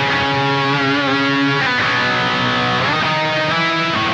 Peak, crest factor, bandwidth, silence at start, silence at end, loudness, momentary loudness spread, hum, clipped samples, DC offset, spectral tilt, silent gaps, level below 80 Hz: -6 dBFS; 10 dB; 8.8 kHz; 0 s; 0 s; -15 LUFS; 1 LU; none; under 0.1%; under 0.1%; -5 dB/octave; none; -50 dBFS